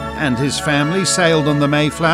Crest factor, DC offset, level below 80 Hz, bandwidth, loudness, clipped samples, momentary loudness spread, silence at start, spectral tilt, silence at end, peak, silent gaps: 14 dB; under 0.1%; -40 dBFS; 15 kHz; -15 LUFS; under 0.1%; 4 LU; 0 s; -4.5 dB/octave; 0 s; -2 dBFS; none